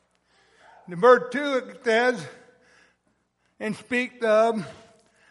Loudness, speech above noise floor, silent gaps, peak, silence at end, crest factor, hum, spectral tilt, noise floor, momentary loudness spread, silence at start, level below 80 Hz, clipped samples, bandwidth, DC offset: -23 LUFS; 48 dB; none; -4 dBFS; 0.6 s; 22 dB; 60 Hz at -65 dBFS; -5 dB/octave; -71 dBFS; 17 LU; 0.9 s; -74 dBFS; under 0.1%; 11.5 kHz; under 0.1%